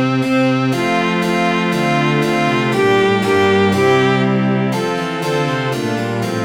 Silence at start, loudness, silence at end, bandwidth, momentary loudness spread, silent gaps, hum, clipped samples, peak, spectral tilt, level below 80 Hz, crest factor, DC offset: 0 s; -15 LUFS; 0 s; 18 kHz; 6 LU; none; none; under 0.1%; -2 dBFS; -6 dB/octave; -54 dBFS; 14 dB; 0.2%